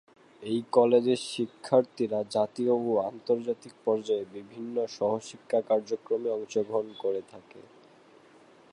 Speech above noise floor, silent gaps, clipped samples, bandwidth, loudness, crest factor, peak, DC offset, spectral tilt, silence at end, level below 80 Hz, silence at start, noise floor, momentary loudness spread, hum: 28 dB; none; under 0.1%; 11.5 kHz; -29 LUFS; 20 dB; -8 dBFS; under 0.1%; -5.5 dB/octave; 1.1 s; -78 dBFS; 0.4 s; -57 dBFS; 10 LU; none